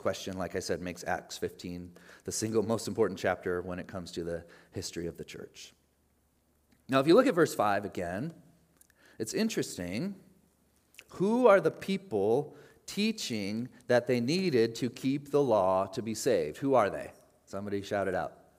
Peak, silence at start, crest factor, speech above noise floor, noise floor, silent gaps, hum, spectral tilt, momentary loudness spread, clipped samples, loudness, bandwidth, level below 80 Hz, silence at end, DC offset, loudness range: -8 dBFS; 0 s; 22 dB; 41 dB; -71 dBFS; none; none; -5 dB/octave; 17 LU; under 0.1%; -30 LUFS; 15.5 kHz; -70 dBFS; 0.25 s; under 0.1%; 7 LU